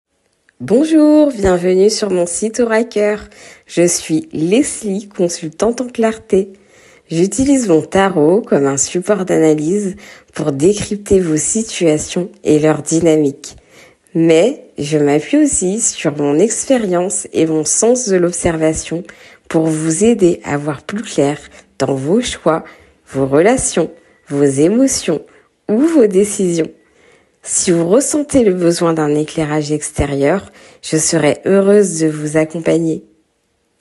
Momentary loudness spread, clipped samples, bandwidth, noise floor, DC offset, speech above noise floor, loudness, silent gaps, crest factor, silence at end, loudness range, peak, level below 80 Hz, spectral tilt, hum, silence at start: 9 LU; under 0.1%; 12.5 kHz; -63 dBFS; under 0.1%; 49 dB; -14 LUFS; none; 14 dB; 0.8 s; 3 LU; 0 dBFS; -42 dBFS; -5 dB/octave; none; 0.6 s